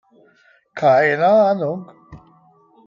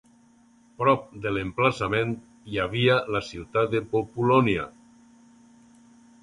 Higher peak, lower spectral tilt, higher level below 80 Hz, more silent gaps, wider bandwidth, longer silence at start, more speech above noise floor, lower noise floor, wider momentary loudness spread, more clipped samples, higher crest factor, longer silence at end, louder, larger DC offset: about the same, -4 dBFS vs -6 dBFS; about the same, -7 dB/octave vs -6.5 dB/octave; second, -60 dBFS vs -54 dBFS; neither; second, 7.2 kHz vs 11 kHz; about the same, 0.75 s vs 0.8 s; first, 40 dB vs 33 dB; about the same, -55 dBFS vs -58 dBFS; first, 15 LU vs 9 LU; neither; about the same, 16 dB vs 20 dB; second, 0.7 s vs 1.55 s; first, -16 LUFS vs -25 LUFS; neither